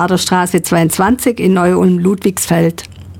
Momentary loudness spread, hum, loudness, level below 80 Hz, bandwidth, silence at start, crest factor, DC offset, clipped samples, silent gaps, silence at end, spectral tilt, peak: 3 LU; none; -12 LUFS; -42 dBFS; 17 kHz; 0 s; 12 dB; under 0.1%; under 0.1%; none; 0 s; -5.5 dB/octave; -2 dBFS